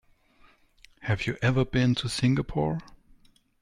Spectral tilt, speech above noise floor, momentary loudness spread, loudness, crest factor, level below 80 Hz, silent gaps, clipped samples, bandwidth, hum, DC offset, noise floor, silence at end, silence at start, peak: -6 dB/octave; 34 dB; 7 LU; -27 LUFS; 16 dB; -48 dBFS; none; under 0.1%; 11.5 kHz; none; under 0.1%; -60 dBFS; 0.65 s; 1 s; -12 dBFS